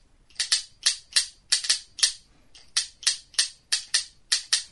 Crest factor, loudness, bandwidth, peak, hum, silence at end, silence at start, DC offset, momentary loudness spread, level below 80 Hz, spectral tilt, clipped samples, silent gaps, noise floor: 26 dB; -25 LUFS; 11.5 kHz; -4 dBFS; none; 0.05 s; 0.4 s; under 0.1%; 5 LU; -62 dBFS; 4.5 dB/octave; under 0.1%; none; -54 dBFS